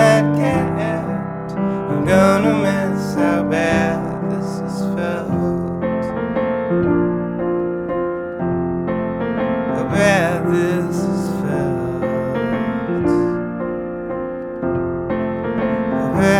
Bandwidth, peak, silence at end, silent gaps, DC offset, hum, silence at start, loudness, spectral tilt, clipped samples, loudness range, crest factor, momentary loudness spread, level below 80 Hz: 15 kHz; -2 dBFS; 0 s; none; under 0.1%; none; 0 s; -19 LUFS; -7 dB/octave; under 0.1%; 4 LU; 16 dB; 8 LU; -42 dBFS